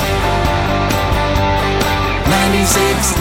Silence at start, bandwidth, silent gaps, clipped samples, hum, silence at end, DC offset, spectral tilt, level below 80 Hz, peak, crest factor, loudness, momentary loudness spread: 0 s; 17 kHz; none; under 0.1%; none; 0 s; under 0.1%; -4 dB/octave; -22 dBFS; -2 dBFS; 12 dB; -14 LUFS; 3 LU